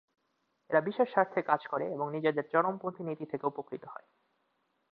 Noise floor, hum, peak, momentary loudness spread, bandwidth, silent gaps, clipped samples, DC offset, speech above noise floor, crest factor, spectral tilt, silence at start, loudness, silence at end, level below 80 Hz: -78 dBFS; none; -10 dBFS; 14 LU; 5 kHz; none; under 0.1%; under 0.1%; 46 dB; 22 dB; -9.5 dB/octave; 0.7 s; -32 LUFS; 0.95 s; -82 dBFS